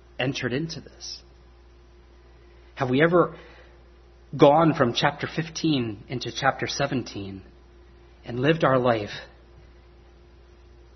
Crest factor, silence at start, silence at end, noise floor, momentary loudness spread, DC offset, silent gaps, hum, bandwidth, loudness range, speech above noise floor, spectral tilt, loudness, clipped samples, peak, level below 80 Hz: 24 dB; 0.2 s; 1.7 s; -51 dBFS; 19 LU; under 0.1%; none; none; 6.4 kHz; 5 LU; 28 dB; -5.5 dB/octave; -24 LUFS; under 0.1%; -2 dBFS; -52 dBFS